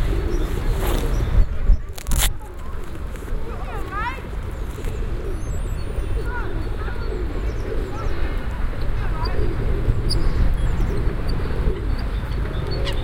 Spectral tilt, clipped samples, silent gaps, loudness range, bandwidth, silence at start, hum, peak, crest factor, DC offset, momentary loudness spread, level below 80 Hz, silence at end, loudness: -5.5 dB/octave; under 0.1%; none; 4 LU; 17 kHz; 0 s; none; -2 dBFS; 18 dB; under 0.1%; 8 LU; -22 dBFS; 0 s; -26 LUFS